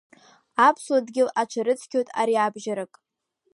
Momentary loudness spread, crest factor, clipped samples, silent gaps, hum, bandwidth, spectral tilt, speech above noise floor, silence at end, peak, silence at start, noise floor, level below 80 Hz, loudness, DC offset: 12 LU; 18 dB; under 0.1%; none; none; 11.5 kHz; -4 dB/octave; 51 dB; 0.7 s; -6 dBFS; 0.6 s; -74 dBFS; -82 dBFS; -24 LUFS; under 0.1%